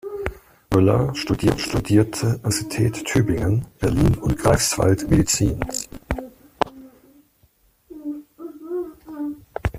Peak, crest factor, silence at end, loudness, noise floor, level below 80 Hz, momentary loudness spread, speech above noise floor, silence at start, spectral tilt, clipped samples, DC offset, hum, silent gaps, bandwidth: -2 dBFS; 20 dB; 0 s; -21 LUFS; -60 dBFS; -36 dBFS; 15 LU; 41 dB; 0.05 s; -5.5 dB/octave; under 0.1%; under 0.1%; none; none; 15.5 kHz